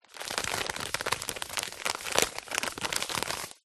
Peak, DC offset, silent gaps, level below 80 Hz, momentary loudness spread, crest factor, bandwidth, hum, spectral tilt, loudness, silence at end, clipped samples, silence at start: -4 dBFS; under 0.1%; none; -58 dBFS; 6 LU; 30 dB; 13 kHz; none; -1 dB/octave; -31 LUFS; 0.1 s; under 0.1%; 0.1 s